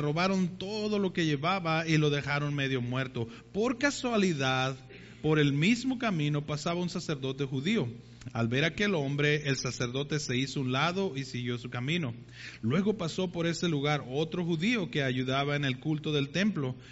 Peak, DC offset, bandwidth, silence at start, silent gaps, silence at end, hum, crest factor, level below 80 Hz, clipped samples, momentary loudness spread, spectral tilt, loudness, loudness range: -14 dBFS; under 0.1%; 8 kHz; 0 s; none; 0 s; none; 16 dB; -60 dBFS; under 0.1%; 8 LU; -4.5 dB/octave; -30 LUFS; 2 LU